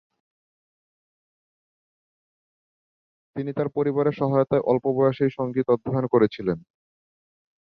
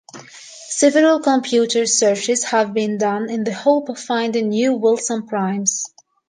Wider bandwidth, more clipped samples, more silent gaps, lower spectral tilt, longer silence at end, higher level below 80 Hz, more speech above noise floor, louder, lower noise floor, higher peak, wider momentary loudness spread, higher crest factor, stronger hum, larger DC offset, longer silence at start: second, 5.6 kHz vs 10 kHz; neither; neither; first, -10.5 dB/octave vs -3 dB/octave; first, 1.15 s vs 0.4 s; first, -62 dBFS vs -72 dBFS; first, over 67 dB vs 22 dB; second, -23 LUFS vs -18 LUFS; first, under -90 dBFS vs -39 dBFS; second, -6 dBFS vs -2 dBFS; about the same, 9 LU vs 11 LU; about the same, 20 dB vs 16 dB; neither; neither; first, 3.35 s vs 0.15 s